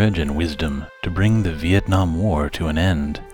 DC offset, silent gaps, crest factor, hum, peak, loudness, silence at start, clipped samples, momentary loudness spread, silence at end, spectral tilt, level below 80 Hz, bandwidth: under 0.1%; none; 14 dB; none; -4 dBFS; -20 LUFS; 0 s; under 0.1%; 7 LU; 0 s; -7 dB/octave; -30 dBFS; 17 kHz